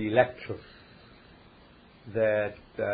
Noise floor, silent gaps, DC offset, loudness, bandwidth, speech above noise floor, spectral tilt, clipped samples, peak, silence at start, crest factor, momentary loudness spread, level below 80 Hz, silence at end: -55 dBFS; none; under 0.1%; -29 LUFS; 5 kHz; 27 dB; -10 dB/octave; under 0.1%; -8 dBFS; 0 s; 24 dB; 21 LU; -60 dBFS; 0 s